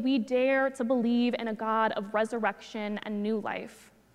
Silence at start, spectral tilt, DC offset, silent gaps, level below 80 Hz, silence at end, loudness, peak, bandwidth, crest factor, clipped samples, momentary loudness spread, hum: 0 s; -5.5 dB/octave; under 0.1%; none; -72 dBFS; 0.35 s; -29 LUFS; -12 dBFS; 11.5 kHz; 16 dB; under 0.1%; 10 LU; none